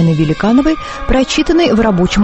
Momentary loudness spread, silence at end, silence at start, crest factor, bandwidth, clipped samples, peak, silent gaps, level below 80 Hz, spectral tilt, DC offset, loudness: 5 LU; 0 s; 0 s; 10 dB; 8.6 kHz; under 0.1%; 0 dBFS; none; -24 dBFS; -6 dB/octave; under 0.1%; -12 LUFS